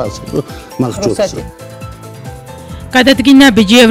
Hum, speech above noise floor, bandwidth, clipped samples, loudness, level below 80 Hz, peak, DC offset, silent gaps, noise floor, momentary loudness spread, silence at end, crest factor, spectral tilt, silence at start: none; 19 dB; 16 kHz; 0.5%; -10 LUFS; -36 dBFS; 0 dBFS; under 0.1%; none; -28 dBFS; 24 LU; 0 s; 12 dB; -4.5 dB/octave; 0 s